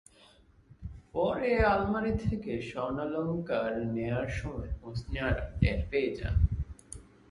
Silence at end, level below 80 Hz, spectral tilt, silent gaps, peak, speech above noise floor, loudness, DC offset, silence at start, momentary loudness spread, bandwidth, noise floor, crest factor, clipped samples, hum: 0.3 s; -38 dBFS; -7.5 dB/octave; none; -12 dBFS; 30 dB; -32 LUFS; under 0.1%; 0.8 s; 14 LU; 11.5 kHz; -60 dBFS; 20 dB; under 0.1%; none